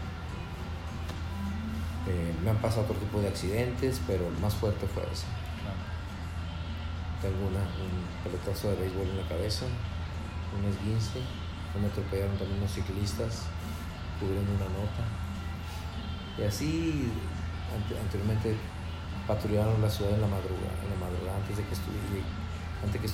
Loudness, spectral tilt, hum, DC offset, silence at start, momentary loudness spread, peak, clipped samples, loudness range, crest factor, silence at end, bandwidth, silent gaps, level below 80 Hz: -33 LUFS; -6.5 dB/octave; none; under 0.1%; 0 s; 8 LU; -16 dBFS; under 0.1%; 4 LU; 16 dB; 0 s; 16 kHz; none; -44 dBFS